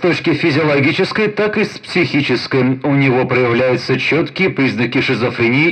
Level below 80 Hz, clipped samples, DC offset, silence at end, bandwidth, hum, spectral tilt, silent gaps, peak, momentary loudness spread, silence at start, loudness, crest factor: -54 dBFS; under 0.1%; under 0.1%; 0 s; 9.2 kHz; none; -6.5 dB/octave; none; -2 dBFS; 3 LU; 0 s; -14 LUFS; 12 dB